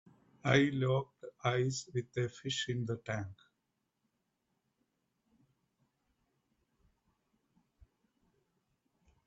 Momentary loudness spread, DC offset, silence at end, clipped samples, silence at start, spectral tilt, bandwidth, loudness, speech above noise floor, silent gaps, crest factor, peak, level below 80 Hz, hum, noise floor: 11 LU; under 0.1%; 5.9 s; under 0.1%; 0.45 s; -5 dB/octave; 8 kHz; -35 LUFS; 50 dB; none; 26 dB; -12 dBFS; -72 dBFS; none; -84 dBFS